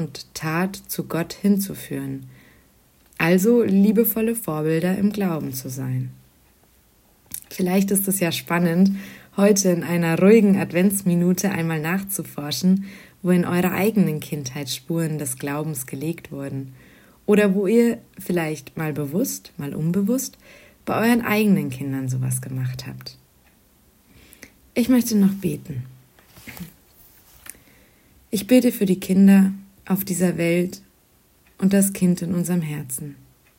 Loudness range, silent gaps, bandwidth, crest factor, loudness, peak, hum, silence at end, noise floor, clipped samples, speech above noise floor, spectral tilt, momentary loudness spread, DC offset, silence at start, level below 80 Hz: 7 LU; none; 16.5 kHz; 18 dB; -21 LUFS; -2 dBFS; none; 0.45 s; -58 dBFS; under 0.1%; 38 dB; -6 dB/octave; 16 LU; under 0.1%; 0 s; -58 dBFS